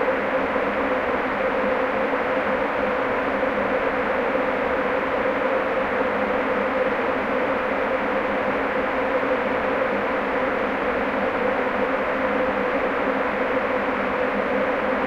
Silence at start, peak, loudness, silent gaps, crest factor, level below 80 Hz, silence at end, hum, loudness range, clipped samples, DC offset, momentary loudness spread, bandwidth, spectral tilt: 0 s; -8 dBFS; -23 LUFS; none; 14 dB; -48 dBFS; 0 s; none; 0 LU; under 0.1%; under 0.1%; 1 LU; 7.6 kHz; -6.5 dB/octave